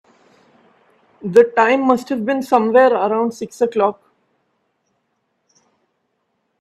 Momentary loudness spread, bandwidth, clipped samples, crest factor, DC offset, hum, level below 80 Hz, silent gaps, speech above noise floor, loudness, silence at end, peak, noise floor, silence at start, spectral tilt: 8 LU; 13 kHz; under 0.1%; 18 dB; under 0.1%; none; -66 dBFS; none; 54 dB; -16 LUFS; 2.7 s; 0 dBFS; -70 dBFS; 1.25 s; -6 dB/octave